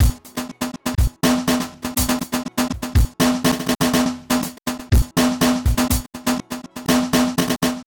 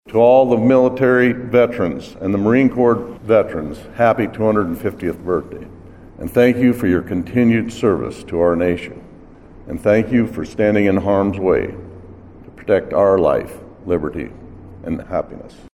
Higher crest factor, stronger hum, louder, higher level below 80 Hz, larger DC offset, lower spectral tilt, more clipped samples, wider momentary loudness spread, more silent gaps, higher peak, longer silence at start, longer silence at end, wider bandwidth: about the same, 14 dB vs 16 dB; neither; second, -20 LUFS vs -17 LUFS; first, -26 dBFS vs -42 dBFS; second, under 0.1% vs 0.2%; second, -4.5 dB/octave vs -8 dB/octave; neither; second, 9 LU vs 16 LU; neither; second, -6 dBFS vs 0 dBFS; about the same, 0 s vs 0.05 s; about the same, 0.05 s vs 0.05 s; first, 19.5 kHz vs 14.5 kHz